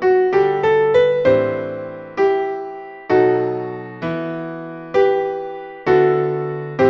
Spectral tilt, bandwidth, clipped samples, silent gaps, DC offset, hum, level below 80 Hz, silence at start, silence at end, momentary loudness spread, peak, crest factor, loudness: -8 dB/octave; 6.2 kHz; under 0.1%; none; under 0.1%; none; -54 dBFS; 0 s; 0 s; 14 LU; -2 dBFS; 16 dB; -18 LUFS